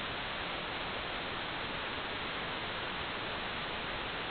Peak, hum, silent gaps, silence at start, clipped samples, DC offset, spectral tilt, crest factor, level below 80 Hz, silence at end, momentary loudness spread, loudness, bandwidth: -26 dBFS; none; none; 0 s; under 0.1%; under 0.1%; -1 dB/octave; 12 dB; -56 dBFS; 0 s; 0 LU; -37 LUFS; 4.9 kHz